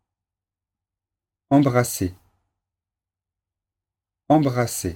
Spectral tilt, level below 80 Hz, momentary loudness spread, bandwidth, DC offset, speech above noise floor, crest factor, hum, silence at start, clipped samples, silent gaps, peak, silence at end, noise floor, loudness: -6 dB/octave; -54 dBFS; 9 LU; 17.5 kHz; under 0.1%; 69 dB; 20 dB; none; 1.5 s; under 0.1%; none; -4 dBFS; 0 s; -89 dBFS; -21 LUFS